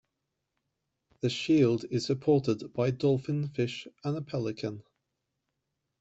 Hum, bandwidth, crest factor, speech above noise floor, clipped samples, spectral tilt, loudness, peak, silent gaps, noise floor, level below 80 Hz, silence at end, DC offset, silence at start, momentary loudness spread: none; 8.2 kHz; 18 dB; 55 dB; under 0.1%; -7 dB/octave; -30 LUFS; -14 dBFS; none; -84 dBFS; -68 dBFS; 1.2 s; under 0.1%; 1.25 s; 11 LU